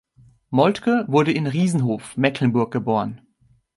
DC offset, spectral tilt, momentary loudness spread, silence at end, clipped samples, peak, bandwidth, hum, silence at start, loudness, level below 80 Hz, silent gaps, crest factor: under 0.1%; -7 dB/octave; 6 LU; 0.6 s; under 0.1%; -4 dBFS; 11.5 kHz; none; 0.5 s; -21 LUFS; -60 dBFS; none; 18 dB